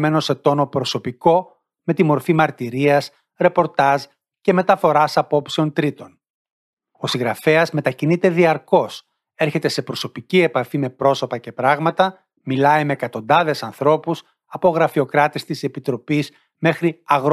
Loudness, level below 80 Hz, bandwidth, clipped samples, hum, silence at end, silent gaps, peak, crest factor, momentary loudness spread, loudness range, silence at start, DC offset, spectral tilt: -19 LUFS; -66 dBFS; 14 kHz; under 0.1%; none; 0 s; 6.30-6.45 s, 6.52-6.77 s; -2 dBFS; 16 dB; 9 LU; 2 LU; 0 s; under 0.1%; -6 dB/octave